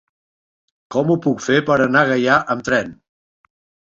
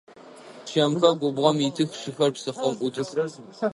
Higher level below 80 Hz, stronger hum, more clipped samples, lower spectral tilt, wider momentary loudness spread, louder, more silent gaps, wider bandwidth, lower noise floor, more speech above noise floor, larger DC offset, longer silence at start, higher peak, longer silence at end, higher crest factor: first, -56 dBFS vs -72 dBFS; neither; neither; about the same, -5.5 dB/octave vs -5.5 dB/octave; second, 6 LU vs 9 LU; first, -17 LUFS vs -25 LUFS; neither; second, 7.8 kHz vs 11.5 kHz; first, under -90 dBFS vs -46 dBFS; first, over 73 dB vs 22 dB; neither; first, 0.9 s vs 0.2 s; about the same, -2 dBFS vs -4 dBFS; first, 0.95 s vs 0 s; about the same, 18 dB vs 20 dB